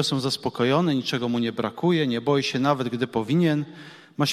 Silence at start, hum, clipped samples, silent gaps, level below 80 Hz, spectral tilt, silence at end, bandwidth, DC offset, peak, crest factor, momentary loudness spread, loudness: 0 s; none; under 0.1%; none; -64 dBFS; -5.5 dB/octave; 0 s; 14.5 kHz; under 0.1%; -8 dBFS; 16 dB; 5 LU; -24 LUFS